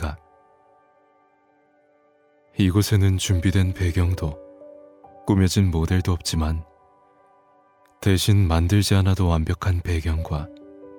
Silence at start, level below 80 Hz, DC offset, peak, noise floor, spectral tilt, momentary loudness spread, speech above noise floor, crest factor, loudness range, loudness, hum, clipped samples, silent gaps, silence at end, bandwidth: 0 s; -34 dBFS; under 0.1%; -4 dBFS; -61 dBFS; -6 dB/octave; 13 LU; 41 dB; 18 dB; 3 LU; -22 LUFS; none; under 0.1%; none; 0 s; 18.5 kHz